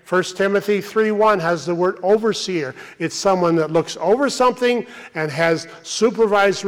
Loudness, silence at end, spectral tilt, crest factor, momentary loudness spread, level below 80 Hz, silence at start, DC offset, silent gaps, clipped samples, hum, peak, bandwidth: -19 LUFS; 0 s; -4.5 dB/octave; 12 dB; 9 LU; -60 dBFS; 0.1 s; under 0.1%; none; under 0.1%; none; -6 dBFS; 15.5 kHz